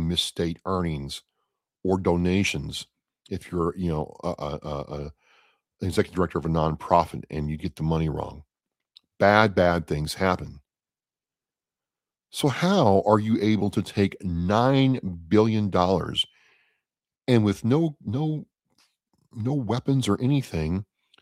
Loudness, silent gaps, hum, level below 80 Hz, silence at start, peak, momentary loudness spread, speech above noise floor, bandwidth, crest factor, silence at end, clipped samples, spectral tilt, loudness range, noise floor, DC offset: -25 LUFS; none; none; -46 dBFS; 0 s; -2 dBFS; 13 LU; over 66 dB; 16 kHz; 24 dB; 0.4 s; under 0.1%; -6.5 dB/octave; 6 LU; under -90 dBFS; under 0.1%